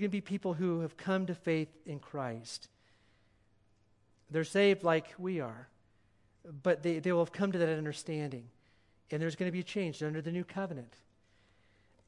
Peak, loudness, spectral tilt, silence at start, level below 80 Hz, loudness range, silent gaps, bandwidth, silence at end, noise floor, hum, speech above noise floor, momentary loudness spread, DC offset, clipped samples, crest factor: -16 dBFS; -35 LUFS; -6.5 dB/octave; 0 s; -76 dBFS; 6 LU; none; 11.5 kHz; 1.2 s; -69 dBFS; none; 35 dB; 12 LU; under 0.1%; under 0.1%; 20 dB